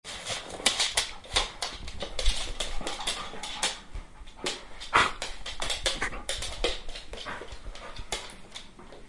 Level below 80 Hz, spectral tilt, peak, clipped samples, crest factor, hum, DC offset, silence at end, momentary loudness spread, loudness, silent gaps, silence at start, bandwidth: -40 dBFS; -1 dB/octave; -2 dBFS; under 0.1%; 30 dB; none; under 0.1%; 0 s; 18 LU; -30 LUFS; none; 0.05 s; 11.5 kHz